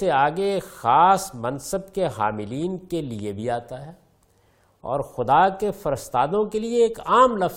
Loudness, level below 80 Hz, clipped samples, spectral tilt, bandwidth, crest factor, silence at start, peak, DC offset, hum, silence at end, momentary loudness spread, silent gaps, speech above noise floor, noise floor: -22 LUFS; -52 dBFS; under 0.1%; -5.5 dB/octave; 17 kHz; 18 dB; 0 s; -4 dBFS; under 0.1%; none; 0 s; 12 LU; none; 39 dB; -61 dBFS